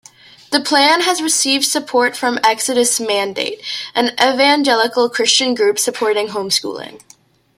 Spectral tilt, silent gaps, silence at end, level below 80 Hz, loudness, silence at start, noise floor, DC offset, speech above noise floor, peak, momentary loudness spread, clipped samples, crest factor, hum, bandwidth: -1 dB/octave; none; 0.6 s; -66 dBFS; -15 LUFS; 0.5 s; -40 dBFS; under 0.1%; 24 dB; 0 dBFS; 9 LU; under 0.1%; 16 dB; none; 16.5 kHz